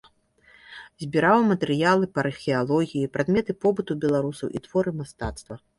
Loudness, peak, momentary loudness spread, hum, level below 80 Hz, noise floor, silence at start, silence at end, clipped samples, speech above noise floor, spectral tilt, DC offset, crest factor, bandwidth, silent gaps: -24 LUFS; -6 dBFS; 14 LU; none; -50 dBFS; -58 dBFS; 0.7 s; 0.2 s; under 0.1%; 34 dB; -6.5 dB/octave; under 0.1%; 18 dB; 11.5 kHz; none